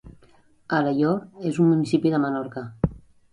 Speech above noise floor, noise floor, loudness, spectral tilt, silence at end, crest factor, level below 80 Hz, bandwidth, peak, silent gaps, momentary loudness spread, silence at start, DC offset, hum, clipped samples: 34 dB; -56 dBFS; -23 LUFS; -8 dB/octave; 0.35 s; 16 dB; -46 dBFS; 10.5 kHz; -8 dBFS; none; 9 LU; 0.05 s; under 0.1%; none; under 0.1%